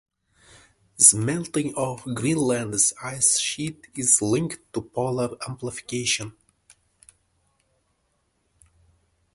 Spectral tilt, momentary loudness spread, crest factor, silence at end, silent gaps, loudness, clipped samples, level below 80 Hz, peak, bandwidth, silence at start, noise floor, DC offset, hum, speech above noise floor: -3 dB/octave; 17 LU; 26 dB; 3.05 s; none; -22 LUFS; under 0.1%; -60 dBFS; 0 dBFS; 12 kHz; 1 s; -71 dBFS; under 0.1%; none; 47 dB